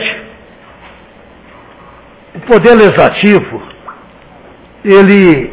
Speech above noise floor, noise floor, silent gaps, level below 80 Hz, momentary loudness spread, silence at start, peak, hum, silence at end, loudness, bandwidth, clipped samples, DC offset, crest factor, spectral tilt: 32 dB; -38 dBFS; none; -42 dBFS; 21 LU; 0 s; 0 dBFS; none; 0 s; -7 LUFS; 4 kHz; 1%; under 0.1%; 10 dB; -10.5 dB/octave